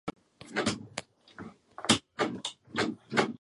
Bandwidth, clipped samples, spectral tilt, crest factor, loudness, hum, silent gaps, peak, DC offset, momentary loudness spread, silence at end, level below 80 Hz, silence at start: 11.5 kHz; under 0.1%; -3 dB/octave; 26 dB; -32 LUFS; none; none; -8 dBFS; under 0.1%; 20 LU; 0.05 s; -64 dBFS; 0.05 s